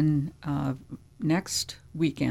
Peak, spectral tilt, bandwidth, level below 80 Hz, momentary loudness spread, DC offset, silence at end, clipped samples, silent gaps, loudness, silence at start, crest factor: -12 dBFS; -5 dB/octave; 16 kHz; -54 dBFS; 9 LU; under 0.1%; 0 s; under 0.1%; none; -30 LUFS; 0 s; 16 dB